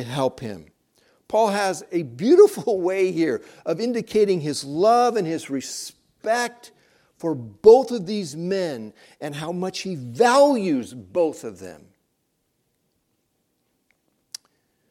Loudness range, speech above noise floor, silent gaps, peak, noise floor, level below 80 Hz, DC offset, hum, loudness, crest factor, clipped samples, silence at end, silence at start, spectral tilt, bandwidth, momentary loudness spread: 4 LU; 51 dB; none; -2 dBFS; -72 dBFS; -64 dBFS; under 0.1%; none; -21 LUFS; 20 dB; under 0.1%; 3.15 s; 0 s; -5 dB/octave; 15.5 kHz; 20 LU